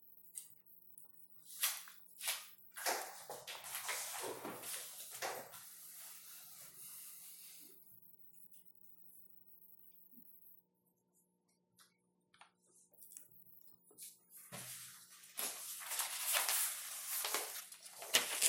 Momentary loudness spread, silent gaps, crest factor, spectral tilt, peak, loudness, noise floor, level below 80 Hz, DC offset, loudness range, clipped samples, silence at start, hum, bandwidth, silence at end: 22 LU; none; 36 dB; 1 dB/octave; -10 dBFS; -42 LUFS; -81 dBFS; under -90 dBFS; under 0.1%; 22 LU; under 0.1%; 0 s; 60 Hz at -80 dBFS; 17 kHz; 0 s